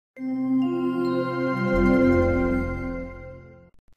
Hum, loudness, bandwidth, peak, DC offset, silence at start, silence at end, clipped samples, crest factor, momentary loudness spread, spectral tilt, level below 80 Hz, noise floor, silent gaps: none; -23 LUFS; 6.6 kHz; -8 dBFS; under 0.1%; 0.15 s; 0.45 s; under 0.1%; 16 dB; 15 LU; -8.5 dB/octave; -38 dBFS; -45 dBFS; none